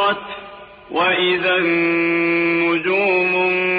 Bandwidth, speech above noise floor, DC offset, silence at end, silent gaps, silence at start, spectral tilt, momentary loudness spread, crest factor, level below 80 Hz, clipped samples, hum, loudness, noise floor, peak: 5 kHz; 21 dB; under 0.1%; 0 s; none; 0 s; -7.5 dB/octave; 10 LU; 12 dB; -58 dBFS; under 0.1%; none; -17 LUFS; -38 dBFS; -6 dBFS